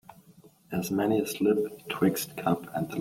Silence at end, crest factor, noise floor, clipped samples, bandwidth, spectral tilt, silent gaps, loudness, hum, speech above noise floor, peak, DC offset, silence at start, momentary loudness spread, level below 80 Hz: 0 s; 20 dB; -57 dBFS; under 0.1%; 16.5 kHz; -5.5 dB/octave; none; -29 LUFS; none; 29 dB; -10 dBFS; under 0.1%; 0.1 s; 7 LU; -64 dBFS